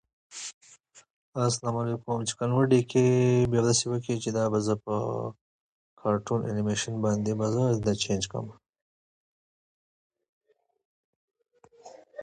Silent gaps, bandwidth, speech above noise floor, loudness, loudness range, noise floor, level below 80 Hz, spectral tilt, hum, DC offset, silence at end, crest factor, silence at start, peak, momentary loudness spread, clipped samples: 0.54-0.61 s, 1.10-1.32 s, 5.41-5.97 s, 8.82-10.10 s, 10.29-10.41 s, 10.85-11.28 s; 9.8 kHz; 31 dB; -27 LUFS; 7 LU; -57 dBFS; -58 dBFS; -5.5 dB/octave; none; under 0.1%; 0 s; 18 dB; 0.3 s; -10 dBFS; 16 LU; under 0.1%